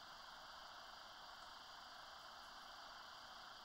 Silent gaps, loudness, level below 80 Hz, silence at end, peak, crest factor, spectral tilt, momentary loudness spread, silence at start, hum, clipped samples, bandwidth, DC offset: none; -56 LUFS; -78 dBFS; 0 s; -44 dBFS; 14 dB; -1 dB/octave; 1 LU; 0 s; none; under 0.1%; 16 kHz; under 0.1%